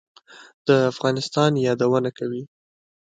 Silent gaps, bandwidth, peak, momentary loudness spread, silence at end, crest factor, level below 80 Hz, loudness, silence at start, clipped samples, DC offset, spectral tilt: 0.54-0.65 s; 9.2 kHz; -4 dBFS; 11 LU; 0.7 s; 20 dB; -66 dBFS; -21 LUFS; 0.35 s; under 0.1%; under 0.1%; -6 dB/octave